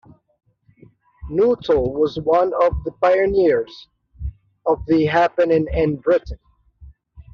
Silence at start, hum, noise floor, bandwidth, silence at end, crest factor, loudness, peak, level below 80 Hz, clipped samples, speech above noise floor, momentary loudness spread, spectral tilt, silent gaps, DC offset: 1.2 s; none; -51 dBFS; 6.8 kHz; 0.1 s; 16 dB; -18 LUFS; -4 dBFS; -38 dBFS; under 0.1%; 34 dB; 18 LU; -5.5 dB/octave; none; under 0.1%